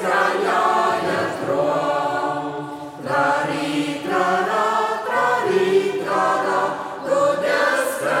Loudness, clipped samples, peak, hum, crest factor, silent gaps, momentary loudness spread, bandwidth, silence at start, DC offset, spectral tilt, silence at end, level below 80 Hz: -20 LUFS; under 0.1%; -4 dBFS; none; 16 dB; none; 6 LU; 16.5 kHz; 0 s; under 0.1%; -4.5 dB/octave; 0 s; -68 dBFS